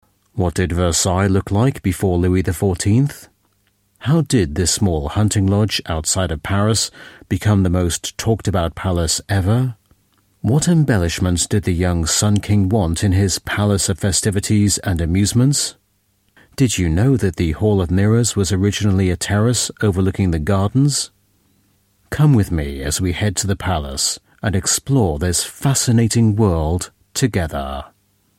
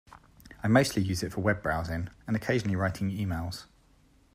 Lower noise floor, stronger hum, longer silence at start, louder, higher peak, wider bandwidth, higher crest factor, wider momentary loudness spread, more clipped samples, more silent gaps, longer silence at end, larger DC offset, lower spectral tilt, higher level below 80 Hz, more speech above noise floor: about the same, -63 dBFS vs -62 dBFS; neither; first, 0.35 s vs 0.1 s; first, -17 LUFS vs -29 LUFS; first, -2 dBFS vs -10 dBFS; about the same, 16 kHz vs 15.5 kHz; second, 14 dB vs 20 dB; second, 6 LU vs 11 LU; neither; neither; second, 0.5 s vs 0.7 s; neither; about the same, -5 dB/octave vs -6 dB/octave; first, -34 dBFS vs -52 dBFS; first, 46 dB vs 33 dB